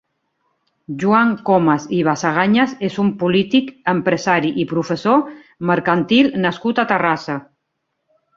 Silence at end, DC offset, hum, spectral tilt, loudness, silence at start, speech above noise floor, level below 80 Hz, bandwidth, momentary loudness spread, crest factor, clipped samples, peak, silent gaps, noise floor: 0.95 s; under 0.1%; none; -6 dB/octave; -17 LUFS; 0.9 s; 57 dB; -58 dBFS; 7.6 kHz; 7 LU; 16 dB; under 0.1%; -2 dBFS; none; -74 dBFS